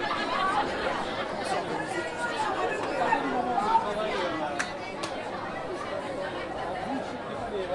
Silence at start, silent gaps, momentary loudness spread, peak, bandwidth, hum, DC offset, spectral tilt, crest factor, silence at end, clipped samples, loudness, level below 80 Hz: 0 s; none; 8 LU; -12 dBFS; 11.5 kHz; none; under 0.1%; -4 dB/octave; 18 dB; 0 s; under 0.1%; -30 LUFS; -56 dBFS